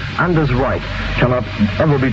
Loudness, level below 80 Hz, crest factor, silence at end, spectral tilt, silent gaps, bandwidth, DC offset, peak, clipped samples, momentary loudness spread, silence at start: -16 LUFS; -28 dBFS; 14 dB; 0 s; -8 dB/octave; none; 7.6 kHz; under 0.1%; -2 dBFS; under 0.1%; 5 LU; 0 s